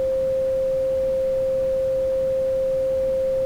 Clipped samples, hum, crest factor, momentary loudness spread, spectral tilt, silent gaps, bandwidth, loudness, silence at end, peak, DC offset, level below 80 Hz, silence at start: under 0.1%; none; 6 dB; 0 LU; -6.5 dB/octave; none; 10.5 kHz; -22 LUFS; 0 s; -16 dBFS; under 0.1%; -44 dBFS; 0 s